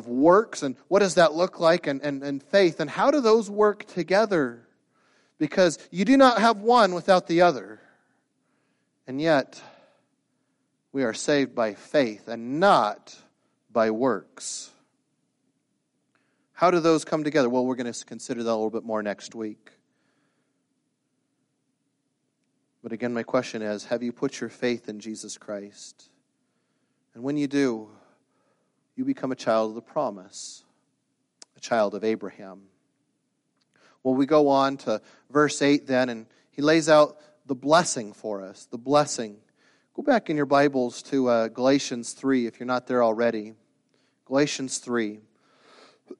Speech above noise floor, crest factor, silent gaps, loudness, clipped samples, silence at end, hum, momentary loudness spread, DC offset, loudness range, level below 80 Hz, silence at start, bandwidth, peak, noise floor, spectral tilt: 52 dB; 20 dB; none; -24 LUFS; under 0.1%; 0.05 s; none; 17 LU; under 0.1%; 10 LU; -72 dBFS; 0 s; 11.5 kHz; -6 dBFS; -75 dBFS; -4.5 dB/octave